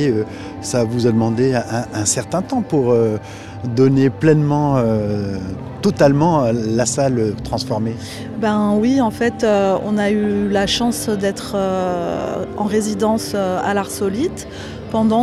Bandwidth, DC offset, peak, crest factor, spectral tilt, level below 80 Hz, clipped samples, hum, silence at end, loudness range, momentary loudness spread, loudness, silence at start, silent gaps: 14.5 kHz; 0.1%; 0 dBFS; 16 dB; -5.5 dB/octave; -44 dBFS; under 0.1%; none; 0 s; 3 LU; 9 LU; -18 LUFS; 0 s; none